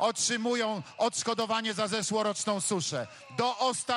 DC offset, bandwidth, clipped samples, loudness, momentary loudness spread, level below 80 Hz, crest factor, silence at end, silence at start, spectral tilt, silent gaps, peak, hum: under 0.1%; 15 kHz; under 0.1%; -30 LUFS; 4 LU; -76 dBFS; 16 dB; 0 s; 0 s; -2.5 dB/octave; none; -14 dBFS; none